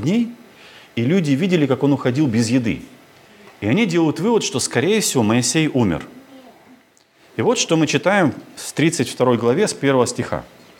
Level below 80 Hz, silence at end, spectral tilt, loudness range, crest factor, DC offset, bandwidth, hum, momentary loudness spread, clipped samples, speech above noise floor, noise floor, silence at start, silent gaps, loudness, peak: -56 dBFS; 0.35 s; -5 dB/octave; 2 LU; 18 dB; under 0.1%; 17.5 kHz; none; 10 LU; under 0.1%; 36 dB; -54 dBFS; 0 s; none; -18 LUFS; -2 dBFS